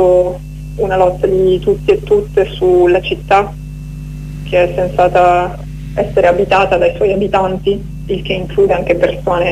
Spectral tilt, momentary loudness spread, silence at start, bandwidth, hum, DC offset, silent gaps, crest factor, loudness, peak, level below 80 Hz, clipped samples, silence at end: -7 dB/octave; 15 LU; 0 s; 13.5 kHz; 50 Hz at -25 dBFS; under 0.1%; none; 12 dB; -13 LUFS; 0 dBFS; -30 dBFS; under 0.1%; 0 s